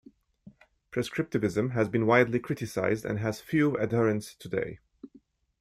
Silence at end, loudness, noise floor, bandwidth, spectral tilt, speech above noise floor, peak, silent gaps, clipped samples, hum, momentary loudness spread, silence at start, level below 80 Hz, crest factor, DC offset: 0.55 s; -28 LUFS; -60 dBFS; 15.5 kHz; -7 dB/octave; 33 dB; -8 dBFS; none; under 0.1%; none; 11 LU; 0.45 s; -62 dBFS; 22 dB; under 0.1%